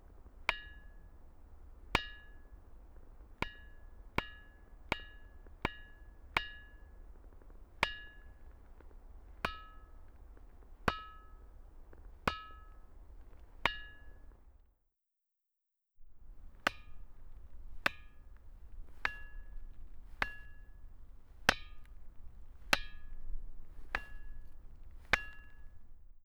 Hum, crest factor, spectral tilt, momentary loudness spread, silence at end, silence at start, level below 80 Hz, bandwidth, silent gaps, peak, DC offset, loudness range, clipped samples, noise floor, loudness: none; 34 dB; -3 dB/octave; 24 LU; 0 s; 0 s; -50 dBFS; over 20 kHz; none; -8 dBFS; under 0.1%; 6 LU; under 0.1%; -87 dBFS; -39 LUFS